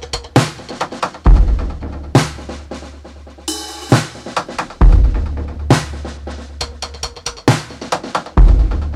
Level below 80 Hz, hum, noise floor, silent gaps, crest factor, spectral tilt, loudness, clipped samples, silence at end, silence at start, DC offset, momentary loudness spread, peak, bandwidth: -16 dBFS; none; -36 dBFS; none; 14 dB; -5.5 dB/octave; -17 LUFS; under 0.1%; 0 s; 0 s; under 0.1%; 16 LU; 0 dBFS; 12.5 kHz